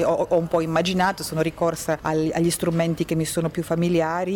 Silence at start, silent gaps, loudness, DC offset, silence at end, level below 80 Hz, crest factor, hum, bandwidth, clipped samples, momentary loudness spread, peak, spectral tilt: 0 s; none; -23 LUFS; under 0.1%; 0 s; -48 dBFS; 12 dB; none; 17.5 kHz; under 0.1%; 4 LU; -10 dBFS; -5.5 dB/octave